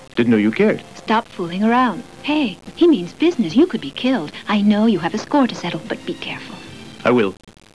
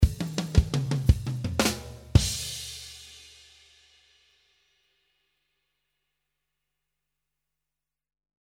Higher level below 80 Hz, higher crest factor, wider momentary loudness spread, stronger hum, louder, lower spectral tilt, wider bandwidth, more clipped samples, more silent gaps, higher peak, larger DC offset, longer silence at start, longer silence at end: second, -56 dBFS vs -36 dBFS; second, 16 dB vs 26 dB; second, 11 LU vs 18 LU; second, none vs 50 Hz at -60 dBFS; first, -18 LUFS vs -27 LUFS; about the same, -6 dB/octave vs -5 dB/octave; second, 11 kHz vs 17 kHz; neither; neither; about the same, -2 dBFS vs -4 dBFS; first, 0.4% vs under 0.1%; about the same, 0 s vs 0 s; second, 0.4 s vs 5.35 s